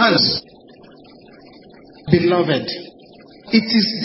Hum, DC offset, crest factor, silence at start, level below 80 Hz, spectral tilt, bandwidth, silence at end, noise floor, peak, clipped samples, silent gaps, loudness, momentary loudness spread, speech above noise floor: none; under 0.1%; 20 dB; 0 s; -52 dBFS; -8.5 dB/octave; 5.8 kHz; 0 s; -44 dBFS; 0 dBFS; under 0.1%; none; -17 LUFS; 16 LU; 28 dB